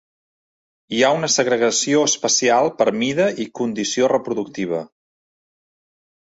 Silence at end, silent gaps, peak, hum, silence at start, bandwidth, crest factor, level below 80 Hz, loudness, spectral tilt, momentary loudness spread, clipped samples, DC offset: 1.35 s; none; -2 dBFS; none; 0.9 s; 8.2 kHz; 18 dB; -64 dBFS; -18 LUFS; -2.5 dB/octave; 9 LU; under 0.1%; under 0.1%